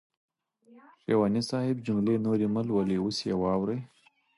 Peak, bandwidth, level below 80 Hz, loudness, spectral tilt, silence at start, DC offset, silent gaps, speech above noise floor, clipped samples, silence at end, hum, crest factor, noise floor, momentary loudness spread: -14 dBFS; 11.5 kHz; -60 dBFS; -28 LUFS; -7 dB/octave; 0.75 s; under 0.1%; none; 32 dB; under 0.1%; 0.5 s; none; 16 dB; -60 dBFS; 4 LU